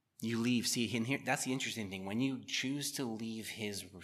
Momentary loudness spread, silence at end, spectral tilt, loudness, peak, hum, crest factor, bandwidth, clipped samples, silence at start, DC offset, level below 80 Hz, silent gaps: 8 LU; 0 s; -3.5 dB/octave; -36 LUFS; -18 dBFS; none; 20 dB; 15 kHz; under 0.1%; 0.2 s; under 0.1%; -82 dBFS; none